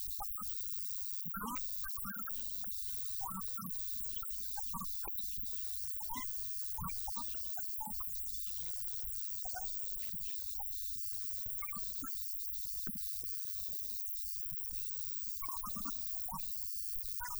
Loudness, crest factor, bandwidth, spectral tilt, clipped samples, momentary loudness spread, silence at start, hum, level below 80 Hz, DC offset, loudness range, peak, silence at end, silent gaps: -37 LUFS; 18 dB; over 20 kHz; -2 dB/octave; under 0.1%; 1 LU; 0 s; none; -58 dBFS; under 0.1%; 0 LU; -22 dBFS; 0 s; none